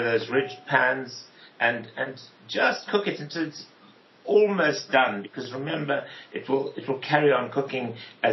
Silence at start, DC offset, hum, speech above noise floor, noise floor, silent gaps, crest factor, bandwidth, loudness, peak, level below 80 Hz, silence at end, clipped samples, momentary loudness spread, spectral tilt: 0 s; under 0.1%; none; 29 dB; -54 dBFS; none; 20 dB; 6.2 kHz; -25 LUFS; -6 dBFS; -84 dBFS; 0 s; under 0.1%; 14 LU; -3 dB/octave